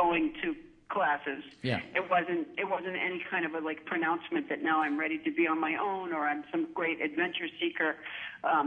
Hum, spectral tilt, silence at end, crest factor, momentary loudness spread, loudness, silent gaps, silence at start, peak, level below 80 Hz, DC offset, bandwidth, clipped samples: none; -7 dB/octave; 0 s; 18 dB; 7 LU; -32 LUFS; none; 0 s; -14 dBFS; -70 dBFS; under 0.1%; 5.2 kHz; under 0.1%